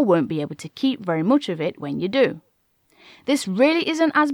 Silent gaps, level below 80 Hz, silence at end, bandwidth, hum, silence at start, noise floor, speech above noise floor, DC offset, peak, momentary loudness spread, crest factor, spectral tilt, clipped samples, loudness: none; -70 dBFS; 0 s; 14.5 kHz; none; 0 s; -64 dBFS; 43 dB; under 0.1%; -6 dBFS; 9 LU; 16 dB; -5.5 dB/octave; under 0.1%; -21 LUFS